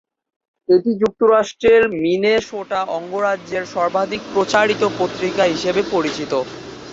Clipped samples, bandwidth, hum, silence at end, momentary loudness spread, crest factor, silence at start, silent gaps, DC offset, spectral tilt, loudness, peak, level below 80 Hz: under 0.1%; 8 kHz; none; 0 s; 9 LU; 16 dB; 0.7 s; none; under 0.1%; -4.5 dB/octave; -18 LUFS; -2 dBFS; -54 dBFS